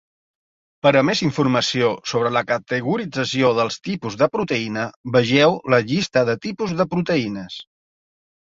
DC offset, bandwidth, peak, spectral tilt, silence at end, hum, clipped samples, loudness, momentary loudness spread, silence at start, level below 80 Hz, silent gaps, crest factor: under 0.1%; 7.8 kHz; -2 dBFS; -5.5 dB/octave; 0.9 s; none; under 0.1%; -20 LUFS; 10 LU; 0.85 s; -58 dBFS; 4.96-5.04 s; 20 dB